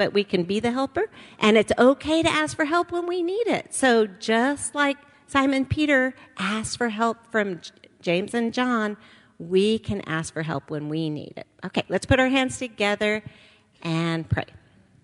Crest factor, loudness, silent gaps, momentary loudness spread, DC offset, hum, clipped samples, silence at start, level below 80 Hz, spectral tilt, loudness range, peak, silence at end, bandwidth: 20 dB; -24 LUFS; none; 11 LU; under 0.1%; none; under 0.1%; 0 s; -50 dBFS; -4.5 dB/octave; 4 LU; -4 dBFS; 0.45 s; 11.5 kHz